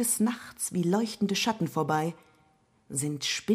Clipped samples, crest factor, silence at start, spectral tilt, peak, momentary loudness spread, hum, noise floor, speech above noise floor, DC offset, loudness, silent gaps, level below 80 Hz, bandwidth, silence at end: under 0.1%; 16 dB; 0 s; -4 dB/octave; -14 dBFS; 6 LU; none; -65 dBFS; 37 dB; under 0.1%; -29 LUFS; none; -70 dBFS; 15.5 kHz; 0 s